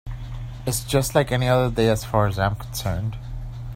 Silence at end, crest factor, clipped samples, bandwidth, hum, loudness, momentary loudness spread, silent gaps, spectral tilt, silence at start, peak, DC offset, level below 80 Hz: 0 s; 20 dB; under 0.1%; 16 kHz; none; -22 LUFS; 15 LU; none; -5.5 dB/octave; 0.05 s; -4 dBFS; under 0.1%; -36 dBFS